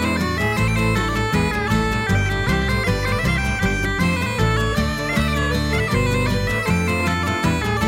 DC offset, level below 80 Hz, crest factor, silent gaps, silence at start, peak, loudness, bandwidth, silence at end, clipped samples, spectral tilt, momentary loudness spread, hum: under 0.1%; -28 dBFS; 14 dB; none; 0 s; -6 dBFS; -20 LUFS; 16.5 kHz; 0 s; under 0.1%; -5.5 dB/octave; 1 LU; none